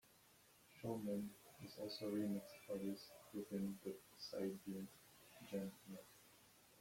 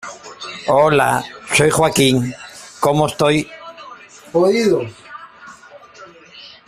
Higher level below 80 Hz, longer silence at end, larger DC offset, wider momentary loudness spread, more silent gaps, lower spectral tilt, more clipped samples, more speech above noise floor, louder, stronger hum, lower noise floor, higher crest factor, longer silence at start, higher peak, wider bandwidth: second, -82 dBFS vs -50 dBFS; second, 0 s vs 0.2 s; neither; about the same, 21 LU vs 23 LU; neither; first, -6 dB/octave vs -4.5 dB/octave; neither; second, 23 dB vs 27 dB; second, -49 LUFS vs -16 LUFS; neither; first, -71 dBFS vs -41 dBFS; about the same, 16 dB vs 16 dB; about the same, 0.05 s vs 0.05 s; second, -34 dBFS vs -2 dBFS; about the same, 16.5 kHz vs 15.5 kHz